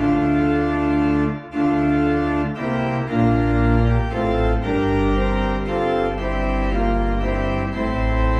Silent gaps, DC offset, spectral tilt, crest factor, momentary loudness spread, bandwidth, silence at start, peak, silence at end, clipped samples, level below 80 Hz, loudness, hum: none; under 0.1%; -8.5 dB/octave; 14 dB; 5 LU; 7.4 kHz; 0 s; -6 dBFS; 0 s; under 0.1%; -26 dBFS; -20 LUFS; none